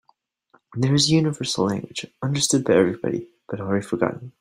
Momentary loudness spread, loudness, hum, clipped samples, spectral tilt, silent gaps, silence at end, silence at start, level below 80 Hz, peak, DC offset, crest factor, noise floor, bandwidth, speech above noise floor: 14 LU; -22 LUFS; none; under 0.1%; -4.5 dB/octave; none; 0.1 s; 0.75 s; -60 dBFS; -4 dBFS; under 0.1%; 18 dB; -64 dBFS; 16 kHz; 43 dB